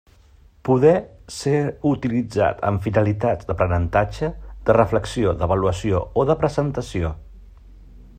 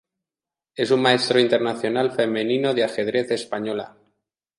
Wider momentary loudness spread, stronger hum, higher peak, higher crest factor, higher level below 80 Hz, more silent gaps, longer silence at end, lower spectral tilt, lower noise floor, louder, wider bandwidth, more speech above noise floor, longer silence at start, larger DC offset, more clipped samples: about the same, 10 LU vs 10 LU; neither; about the same, -2 dBFS vs -2 dBFS; about the same, 18 dB vs 20 dB; first, -40 dBFS vs -70 dBFS; neither; second, 0.15 s vs 0.7 s; first, -7.5 dB/octave vs -5 dB/octave; second, -51 dBFS vs under -90 dBFS; about the same, -21 LUFS vs -21 LUFS; first, 14 kHz vs 11.5 kHz; second, 31 dB vs over 69 dB; about the same, 0.65 s vs 0.75 s; neither; neither